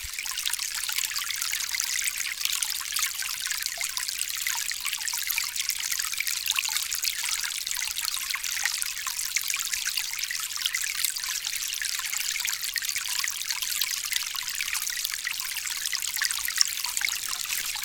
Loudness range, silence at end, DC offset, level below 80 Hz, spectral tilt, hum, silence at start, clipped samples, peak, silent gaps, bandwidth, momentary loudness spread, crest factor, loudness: 1 LU; 0 s; under 0.1%; -60 dBFS; 4 dB/octave; none; 0 s; under 0.1%; -2 dBFS; none; 19 kHz; 3 LU; 28 dB; -27 LUFS